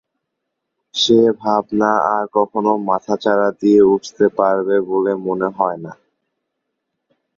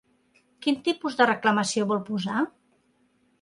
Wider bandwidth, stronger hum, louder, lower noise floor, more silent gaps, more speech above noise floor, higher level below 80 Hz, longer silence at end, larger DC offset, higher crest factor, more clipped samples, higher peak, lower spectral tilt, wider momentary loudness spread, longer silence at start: second, 7.4 kHz vs 11.5 kHz; neither; first, -16 LUFS vs -25 LUFS; first, -77 dBFS vs -67 dBFS; neither; first, 61 dB vs 42 dB; first, -60 dBFS vs -72 dBFS; first, 1.45 s vs 0.9 s; neither; about the same, 16 dB vs 20 dB; neither; first, 0 dBFS vs -6 dBFS; about the same, -5 dB/octave vs -4 dB/octave; about the same, 8 LU vs 7 LU; first, 0.95 s vs 0.6 s